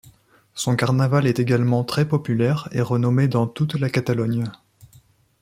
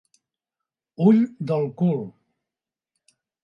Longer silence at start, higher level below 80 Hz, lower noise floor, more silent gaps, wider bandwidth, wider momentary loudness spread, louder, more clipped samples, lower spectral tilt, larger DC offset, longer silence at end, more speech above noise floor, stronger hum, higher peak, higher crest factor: second, 0.55 s vs 1 s; first, -56 dBFS vs -74 dBFS; second, -54 dBFS vs -89 dBFS; neither; first, 15.5 kHz vs 5.6 kHz; second, 5 LU vs 11 LU; about the same, -21 LUFS vs -22 LUFS; neither; second, -7 dB/octave vs -10.5 dB/octave; neither; second, 0.85 s vs 1.35 s; second, 34 dB vs 69 dB; neither; about the same, -6 dBFS vs -6 dBFS; about the same, 16 dB vs 18 dB